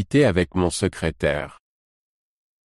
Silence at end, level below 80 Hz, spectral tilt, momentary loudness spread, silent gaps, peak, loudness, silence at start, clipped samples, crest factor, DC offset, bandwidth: 1.1 s; -42 dBFS; -5.5 dB/octave; 9 LU; none; -6 dBFS; -22 LUFS; 0 s; under 0.1%; 18 dB; under 0.1%; 12.5 kHz